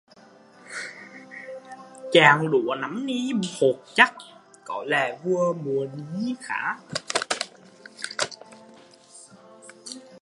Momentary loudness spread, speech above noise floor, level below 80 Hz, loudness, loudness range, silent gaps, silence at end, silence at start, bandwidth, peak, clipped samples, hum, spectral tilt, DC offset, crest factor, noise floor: 21 LU; 29 dB; -74 dBFS; -24 LUFS; 9 LU; none; 0.05 s; 0.65 s; 11.5 kHz; 0 dBFS; under 0.1%; none; -4 dB/octave; under 0.1%; 26 dB; -52 dBFS